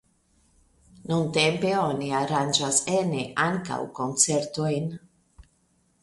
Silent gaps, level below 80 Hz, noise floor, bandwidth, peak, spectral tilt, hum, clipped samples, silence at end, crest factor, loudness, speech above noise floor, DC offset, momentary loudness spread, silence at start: none; -60 dBFS; -67 dBFS; 11.5 kHz; -4 dBFS; -3.5 dB/octave; none; under 0.1%; 0.6 s; 22 dB; -25 LUFS; 42 dB; under 0.1%; 9 LU; 1 s